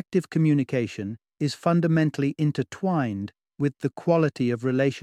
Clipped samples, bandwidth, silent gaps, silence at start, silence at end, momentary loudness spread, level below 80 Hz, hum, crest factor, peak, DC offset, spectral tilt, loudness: under 0.1%; 11 kHz; none; 0.1 s; 0 s; 8 LU; -66 dBFS; none; 16 dB; -8 dBFS; under 0.1%; -7.5 dB/octave; -25 LUFS